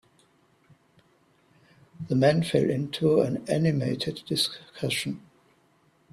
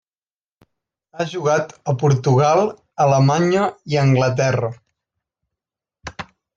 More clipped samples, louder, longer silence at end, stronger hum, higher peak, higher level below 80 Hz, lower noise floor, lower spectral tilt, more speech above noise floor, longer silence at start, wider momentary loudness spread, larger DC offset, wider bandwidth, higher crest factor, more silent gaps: neither; second, -26 LUFS vs -18 LUFS; first, 0.95 s vs 0.35 s; neither; second, -8 dBFS vs -4 dBFS; second, -62 dBFS vs -56 dBFS; second, -64 dBFS vs under -90 dBFS; about the same, -5.5 dB/octave vs -6.5 dB/octave; second, 39 dB vs over 73 dB; first, 2 s vs 1.15 s; second, 11 LU vs 18 LU; neither; first, 14.5 kHz vs 7.6 kHz; about the same, 20 dB vs 16 dB; neither